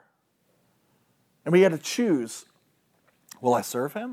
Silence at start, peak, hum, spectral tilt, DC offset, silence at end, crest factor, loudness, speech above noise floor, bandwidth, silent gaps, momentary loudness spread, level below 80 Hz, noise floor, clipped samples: 1.45 s; -8 dBFS; none; -5.5 dB/octave; under 0.1%; 0 s; 20 dB; -24 LUFS; 46 dB; 16 kHz; none; 17 LU; -84 dBFS; -70 dBFS; under 0.1%